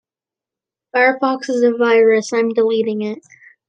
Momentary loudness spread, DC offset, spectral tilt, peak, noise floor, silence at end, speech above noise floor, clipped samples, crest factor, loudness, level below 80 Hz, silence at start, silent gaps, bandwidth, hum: 10 LU; under 0.1%; -4.5 dB/octave; -2 dBFS; -89 dBFS; 0.5 s; 74 dB; under 0.1%; 16 dB; -16 LUFS; -74 dBFS; 0.95 s; none; 9 kHz; none